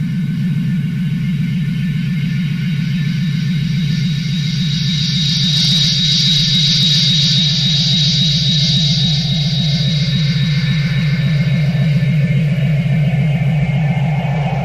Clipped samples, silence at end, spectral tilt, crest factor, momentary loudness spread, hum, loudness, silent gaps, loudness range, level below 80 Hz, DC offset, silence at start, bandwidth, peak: under 0.1%; 0 s; -5 dB/octave; 10 dB; 7 LU; none; -14 LUFS; none; 6 LU; -36 dBFS; under 0.1%; 0 s; 13 kHz; -4 dBFS